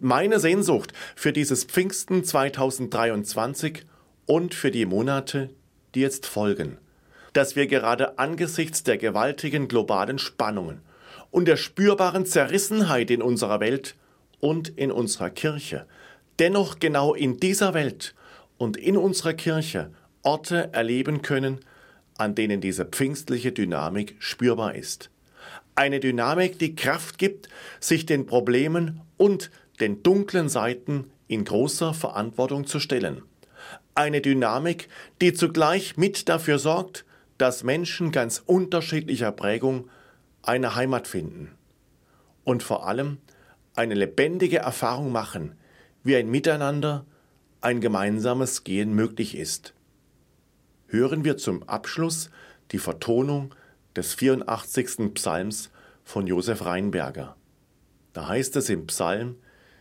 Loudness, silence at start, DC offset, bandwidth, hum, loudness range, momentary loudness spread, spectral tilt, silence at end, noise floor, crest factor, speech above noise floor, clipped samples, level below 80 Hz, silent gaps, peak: -25 LUFS; 0 s; under 0.1%; 16.5 kHz; none; 5 LU; 11 LU; -4.5 dB/octave; 0.45 s; -62 dBFS; 20 dB; 38 dB; under 0.1%; -64 dBFS; none; -6 dBFS